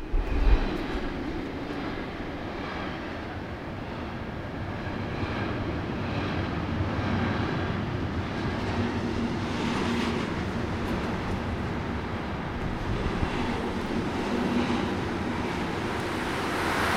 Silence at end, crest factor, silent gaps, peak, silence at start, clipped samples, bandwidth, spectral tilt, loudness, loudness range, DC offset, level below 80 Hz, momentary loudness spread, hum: 0 s; 22 dB; none; -8 dBFS; 0 s; under 0.1%; 15.5 kHz; -6.5 dB/octave; -30 LUFS; 5 LU; under 0.1%; -36 dBFS; 8 LU; none